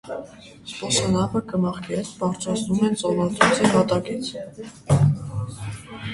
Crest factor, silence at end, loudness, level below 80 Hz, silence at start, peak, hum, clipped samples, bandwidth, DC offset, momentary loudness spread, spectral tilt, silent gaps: 22 dB; 0 s; -22 LUFS; -48 dBFS; 0.05 s; 0 dBFS; none; under 0.1%; 11.5 kHz; under 0.1%; 17 LU; -5 dB/octave; none